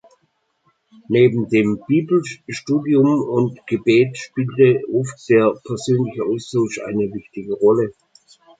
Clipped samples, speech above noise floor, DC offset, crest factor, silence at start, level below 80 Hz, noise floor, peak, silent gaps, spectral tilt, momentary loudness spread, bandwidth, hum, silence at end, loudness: under 0.1%; 49 dB; under 0.1%; 16 dB; 1.1 s; -60 dBFS; -67 dBFS; -2 dBFS; none; -7 dB/octave; 10 LU; 9.2 kHz; none; 0.7 s; -18 LUFS